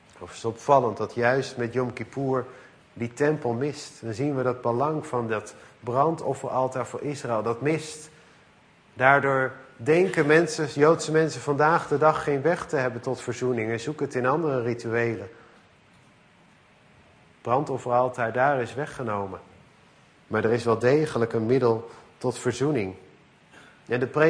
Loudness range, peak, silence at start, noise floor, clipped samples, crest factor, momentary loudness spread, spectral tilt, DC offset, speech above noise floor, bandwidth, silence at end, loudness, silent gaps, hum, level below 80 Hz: 7 LU; -4 dBFS; 0.2 s; -57 dBFS; under 0.1%; 22 dB; 11 LU; -6 dB/octave; under 0.1%; 32 dB; 10.5 kHz; 0 s; -25 LUFS; none; none; -64 dBFS